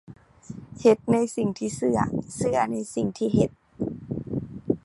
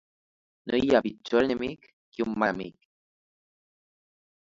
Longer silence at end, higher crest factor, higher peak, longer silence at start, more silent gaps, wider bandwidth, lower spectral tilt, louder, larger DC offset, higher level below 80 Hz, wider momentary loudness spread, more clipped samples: second, 0.05 s vs 1.7 s; about the same, 20 dB vs 22 dB; about the same, -6 dBFS vs -8 dBFS; second, 0.1 s vs 0.65 s; second, none vs 1.93-2.12 s; first, 11.5 kHz vs 7.8 kHz; about the same, -6.5 dB/octave vs -6 dB/octave; about the same, -26 LUFS vs -27 LUFS; neither; first, -52 dBFS vs -60 dBFS; second, 12 LU vs 20 LU; neither